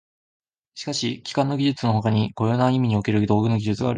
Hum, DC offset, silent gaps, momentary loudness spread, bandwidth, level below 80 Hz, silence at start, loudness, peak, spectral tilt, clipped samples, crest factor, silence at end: none; under 0.1%; none; 6 LU; 9.6 kHz; -52 dBFS; 0.75 s; -22 LUFS; -6 dBFS; -6.5 dB/octave; under 0.1%; 16 dB; 0 s